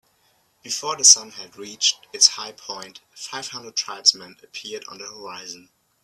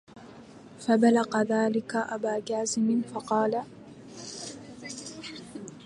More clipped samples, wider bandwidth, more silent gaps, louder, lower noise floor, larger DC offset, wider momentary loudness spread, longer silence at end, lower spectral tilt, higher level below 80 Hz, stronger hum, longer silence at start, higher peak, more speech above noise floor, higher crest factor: neither; first, 15.5 kHz vs 11 kHz; neither; first, -17 LUFS vs -27 LUFS; first, -64 dBFS vs -48 dBFS; neither; about the same, 23 LU vs 22 LU; first, 0.45 s vs 0 s; second, 2 dB/octave vs -4.5 dB/octave; second, -76 dBFS vs -70 dBFS; neither; first, 0.65 s vs 0.15 s; first, 0 dBFS vs -10 dBFS; first, 40 dB vs 22 dB; about the same, 24 dB vs 20 dB